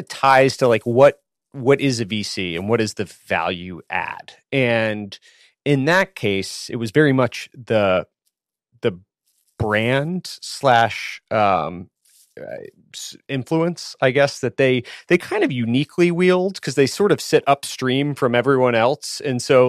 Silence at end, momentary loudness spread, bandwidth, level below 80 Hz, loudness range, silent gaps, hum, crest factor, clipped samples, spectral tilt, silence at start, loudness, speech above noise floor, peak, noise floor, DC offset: 0 s; 14 LU; 15 kHz; -58 dBFS; 5 LU; none; none; 18 dB; under 0.1%; -5.5 dB/octave; 0 s; -19 LUFS; 56 dB; -2 dBFS; -75 dBFS; under 0.1%